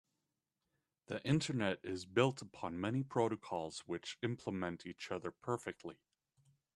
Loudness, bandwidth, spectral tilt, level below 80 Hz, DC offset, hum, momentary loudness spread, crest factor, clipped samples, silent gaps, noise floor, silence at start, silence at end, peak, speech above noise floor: -40 LUFS; 12 kHz; -5.5 dB/octave; -74 dBFS; under 0.1%; none; 11 LU; 22 dB; under 0.1%; none; -89 dBFS; 1.1 s; 0.8 s; -18 dBFS; 49 dB